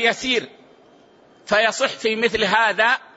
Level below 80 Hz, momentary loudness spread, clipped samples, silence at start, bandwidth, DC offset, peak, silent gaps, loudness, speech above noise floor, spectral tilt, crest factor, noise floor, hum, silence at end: -56 dBFS; 5 LU; under 0.1%; 0 s; 8 kHz; under 0.1%; -4 dBFS; none; -19 LUFS; 32 dB; -2.5 dB/octave; 18 dB; -52 dBFS; none; 0.2 s